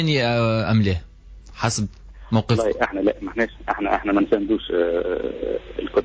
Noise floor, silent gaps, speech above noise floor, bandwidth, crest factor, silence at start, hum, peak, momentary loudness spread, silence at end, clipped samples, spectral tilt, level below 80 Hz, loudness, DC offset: -42 dBFS; none; 21 dB; 8 kHz; 16 dB; 0 s; none; -6 dBFS; 7 LU; 0 s; under 0.1%; -6 dB/octave; -40 dBFS; -22 LUFS; under 0.1%